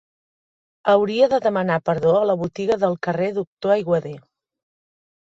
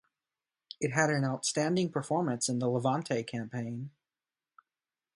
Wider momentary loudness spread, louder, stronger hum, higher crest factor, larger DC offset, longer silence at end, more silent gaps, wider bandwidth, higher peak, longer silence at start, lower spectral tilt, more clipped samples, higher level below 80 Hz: second, 7 LU vs 10 LU; first, -20 LUFS vs -31 LUFS; neither; about the same, 18 dB vs 22 dB; neither; second, 1.05 s vs 1.3 s; first, 3.47-3.57 s vs none; second, 7.8 kHz vs 11.5 kHz; first, -4 dBFS vs -10 dBFS; about the same, 0.85 s vs 0.8 s; first, -7 dB/octave vs -4.5 dB/octave; neither; first, -60 dBFS vs -74 dBFS